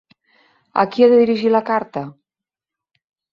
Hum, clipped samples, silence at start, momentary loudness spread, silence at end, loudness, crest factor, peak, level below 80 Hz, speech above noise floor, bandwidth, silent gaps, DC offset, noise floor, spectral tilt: none; under 0.1%; 0.75 s; 16 LU; 1.2 s; -16 LUFS; 18 dB; -2 dBFS; -66 dBFS; 72 dB; 5.8 kHz; none; under 0.1%; -88 dBFS; -7.5 dB/octave